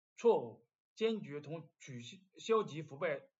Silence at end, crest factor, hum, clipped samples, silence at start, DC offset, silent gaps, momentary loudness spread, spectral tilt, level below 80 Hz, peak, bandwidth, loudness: 0.2 s; 20 dB; none; under 0.1%; 0.2 s; under 0.1%; 0.75-0.96 s; 18 LU; -5.5 dB/octave; under -90 dBFS; -18 dBFS; 7.8 kHz; -37 LUFS